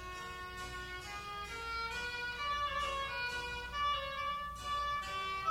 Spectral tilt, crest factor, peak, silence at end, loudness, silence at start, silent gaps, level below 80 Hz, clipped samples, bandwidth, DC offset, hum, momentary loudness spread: -2.5 dB/octave; 14 dB; -24 dBFS; 0 s; -38 LUFS; 0 s; none; -54 dBFS; under 0.1%; 16 kHz; under 0.1%; none; 8 LU